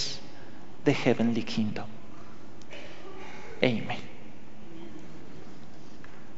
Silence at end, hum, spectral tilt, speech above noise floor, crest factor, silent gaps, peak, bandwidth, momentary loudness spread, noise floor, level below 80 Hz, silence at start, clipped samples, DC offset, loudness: 0 s; none; -5.5 dB/octave; 22 dB; 28 dB; none; -4 dBFS; 8 kHz; 23 LU; -49 dBFS; -62 dBFS; 0 s; under 0.1%; 3%; -29 LUFS